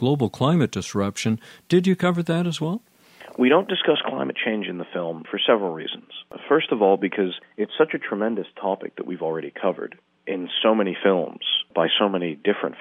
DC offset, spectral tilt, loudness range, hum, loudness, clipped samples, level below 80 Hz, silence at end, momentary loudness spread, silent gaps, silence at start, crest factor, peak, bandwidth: under 0.1%; -5.5 dB/octave; 3 LU; none; -23 LUFS; under 0.1%; -68 dBFS; 0 s; 11 LU; none; 0 s; 18 dB; -4 dBFS; 14.5 kHz